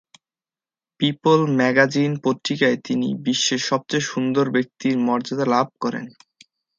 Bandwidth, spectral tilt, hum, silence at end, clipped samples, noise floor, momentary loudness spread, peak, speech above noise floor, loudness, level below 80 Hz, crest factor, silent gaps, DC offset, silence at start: 7.6 kHz; -4.5 dB/octave; none; 0.7 s; under 0.1%; under -90 dBFS; 7 LU; 0 dBFS; over 70 dB; -20 LUFS; -68 dBFS; 20 dB; none; under 0.1%; 1 s